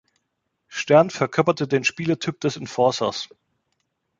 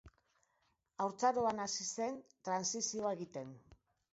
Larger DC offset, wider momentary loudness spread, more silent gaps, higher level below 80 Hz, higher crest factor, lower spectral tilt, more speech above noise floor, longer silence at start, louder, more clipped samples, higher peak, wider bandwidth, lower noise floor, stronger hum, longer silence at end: neither; about the same, 14 LU vs 14 LU; neither; first, -64 dBFS vs -74 dBFS; about the same, 22 dB vs 20 dB; first, -5 dB/octave vs -3 dB/octave; first, 55 dB vs 42 dB; first, 0.7 s vs 0.05 s; first, -21 LUFS vs -38 LUFS; neither; first, -2 dBFS vs -20 dBFS; about the same, 7.8 kHz vs 7.6 kHz; second, -76 dBFS vs -80 dBFS; neither; first, 0.95 s vs 0.4 s